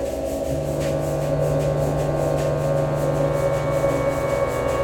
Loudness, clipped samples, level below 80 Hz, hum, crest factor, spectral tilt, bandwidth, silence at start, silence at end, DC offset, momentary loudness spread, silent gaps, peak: -22 LUFS; under 0.1%; -36 dBFS; none; 14 dB; -7 dB/octave; 18.5 kHz; 0 s; 0 s; under 0.1%; 3 LU; none; -8 dBFS